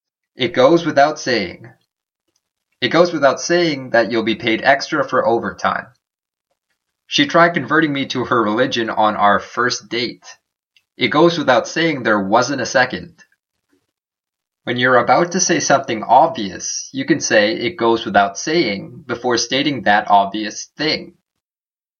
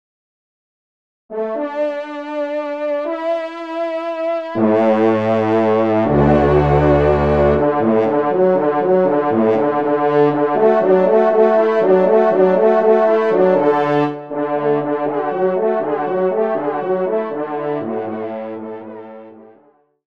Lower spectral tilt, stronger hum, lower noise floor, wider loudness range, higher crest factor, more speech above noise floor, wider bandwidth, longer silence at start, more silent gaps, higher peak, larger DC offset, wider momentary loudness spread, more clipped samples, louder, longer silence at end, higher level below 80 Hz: second, -3.5 dB/octave vs -9 dB/octave; neither; first, under -90 dBFS vs -53 dBFS; second, 3 LU vs 9 LU; about the same, 18 dB vs 14 dB; first, over 74 dB vs 38 dB; first, 7.2 kHz vs 6.4 kHz; second, 0.4 s vs 1.3 s; neither; about the same, 0 dBFS vs -2 dBFS; second, under 0.1% vs 0.4%; about the same, 9 LU vs 11 LU; neither; about the same, -16 LUFS vs -16 LUFS; first, 0.95 s vs 0.65 s; second, -60 dBFS vs -36 dBFS